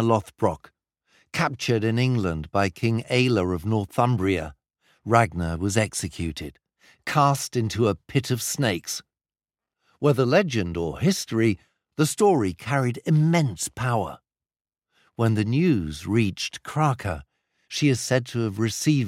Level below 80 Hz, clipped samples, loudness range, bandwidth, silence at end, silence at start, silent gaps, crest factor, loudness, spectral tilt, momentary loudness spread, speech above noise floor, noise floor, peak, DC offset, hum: -52 dBFS; under 0.1%; 2 LU; 16 kHz; 0 s; 0 s; 14.61-14.65 s; 22 dB; -24 LUFS; -5.5 dB/octave; 11 LU; over 67 dB; under -90 dBFS; -2 dBFS; under 0.1%; none